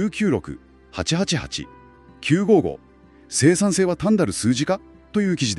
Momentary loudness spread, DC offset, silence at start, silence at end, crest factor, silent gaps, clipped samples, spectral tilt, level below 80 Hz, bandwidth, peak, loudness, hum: 16 LU; under 0.1%; 0 s; 0 s; 18 dB; none; under 0.1%; -5 dB/octave; -48 dBFS; 12.5 kHz; -4 dBFS; -21 LUFS; none